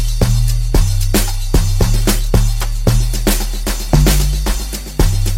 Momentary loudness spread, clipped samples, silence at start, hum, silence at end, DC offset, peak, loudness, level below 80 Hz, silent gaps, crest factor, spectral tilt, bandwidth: 5 LU; under 0.1%; 0 s; none; 0 s; under 0.1%; 0 dBFS; -16 LUFS; -14 dBFS; none; 12 dB; -5 dB/octave; 16.5 kHz